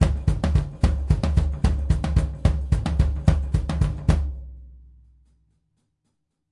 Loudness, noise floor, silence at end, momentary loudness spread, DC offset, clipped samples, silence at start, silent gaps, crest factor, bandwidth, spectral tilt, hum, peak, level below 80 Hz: -24 LUFS; -75 dBFS; 1.75 s; 4 LU; under 0.1%; under 0.1%; 0 s; none; 20 dB; 11 kHz; -7.5 dB/octave; none; -2 dBFS; -26 dBFS